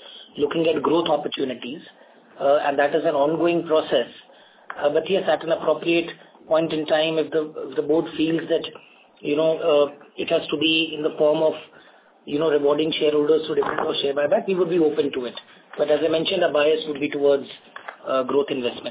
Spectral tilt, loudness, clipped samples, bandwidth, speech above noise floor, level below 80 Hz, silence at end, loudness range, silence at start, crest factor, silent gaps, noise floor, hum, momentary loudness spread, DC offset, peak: -9 dB/octave; -22 LUFS; under 0.1%; 4 kHz; 30 dB; -64 dBFS; 0 s; 2 LU; 0 s; 14 dB; none; -51 dBFS; none; 13 LU; under 0.1%; -8 dBFS